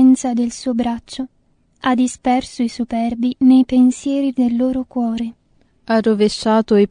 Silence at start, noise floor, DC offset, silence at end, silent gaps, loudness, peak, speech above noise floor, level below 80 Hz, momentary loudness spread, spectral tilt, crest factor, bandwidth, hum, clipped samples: 0 s; -52 dBFS; under 0.1%; 0.05 s; none; -17 LUFS; -4 dBFS; 36 dB; -48 dBFS; 11 LU; -5.5 dB/octave; 14 dB; 10 kHz; none; under 0.1%